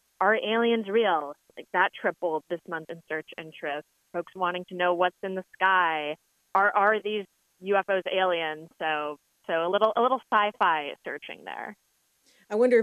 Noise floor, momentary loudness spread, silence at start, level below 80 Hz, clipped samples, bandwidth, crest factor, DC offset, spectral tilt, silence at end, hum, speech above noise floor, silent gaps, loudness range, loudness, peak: -67 dBFS; 14 LU; 0.2 s; -84 dBFS; under 0.1%; 13 kHz; 20 dB; under 0.1%; -5.5 dB/octave; 0 s; none; 40 dB; none; 5 LU; -27 LUFS; -8 dBFS